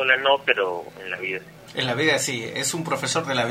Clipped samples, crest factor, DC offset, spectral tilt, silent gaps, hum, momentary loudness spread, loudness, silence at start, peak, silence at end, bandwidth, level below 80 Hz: under 0.1%; 22 dB; under 0.1%; -2.5 dB/octave; none; none; 13 LU; -23 LUFS; 0 s; -2 dBFS; 0 s; 16 kHz; -64 dBFS